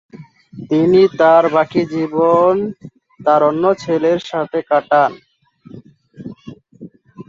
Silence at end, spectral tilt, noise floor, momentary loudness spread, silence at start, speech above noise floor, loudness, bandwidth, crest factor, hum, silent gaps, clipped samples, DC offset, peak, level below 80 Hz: 0.05 s; -7 dB/octave; -42 dBFS; 16 LU; 0.15 s; 28 dB; -14 LUFS; 7.4 kHz; 14 dB; none; none; under 0.1%; under 0.1%; -2 dBFS; -58 dBFS